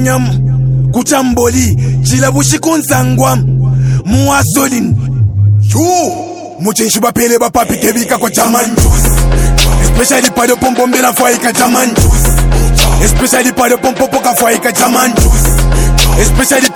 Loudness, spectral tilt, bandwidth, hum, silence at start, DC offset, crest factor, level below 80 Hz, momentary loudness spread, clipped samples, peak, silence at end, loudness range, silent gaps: -9 LUFS; -4.5 dB/octave; over 20 kHz; none; 0 s; under 0.1%; 8 dB; -16 dBFS; 3 LU; 0.6%; 0 dBFS; 0 s; 2 LU; none